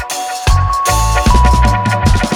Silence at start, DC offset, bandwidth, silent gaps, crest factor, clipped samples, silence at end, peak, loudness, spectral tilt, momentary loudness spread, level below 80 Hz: 0 s; under 0.1%; 17.5 kHz; none; 10 dB; under 0.1%; 0 s; 0 dBFS; -12 LUFS; -4.5 dB/octave; 4 LU; -14 dBFS